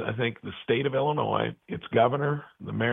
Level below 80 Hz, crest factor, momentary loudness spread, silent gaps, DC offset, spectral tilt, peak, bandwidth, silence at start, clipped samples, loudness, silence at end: -62 dBFS; 18 dB; 11 LU; none; under 0.1%; -9.5 dB/octave; -8 dBFS; 3.9 kHz; 0 s; under 0.1%; -27 LUFS; 0 s